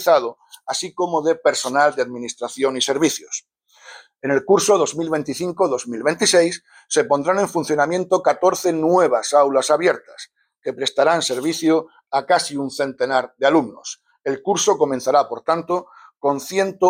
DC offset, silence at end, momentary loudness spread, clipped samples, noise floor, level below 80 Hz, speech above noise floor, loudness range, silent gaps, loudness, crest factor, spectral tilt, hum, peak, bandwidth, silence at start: under 0.1%; 0 s; 12 LU; under 0.1%; -45 dBFS; -68 dBFS; 26 dB; 3 LU; none; -19 LUFS; 16 dB; -3 dB/octave; none; -4 dBFS; 16.5 kHz; 0 s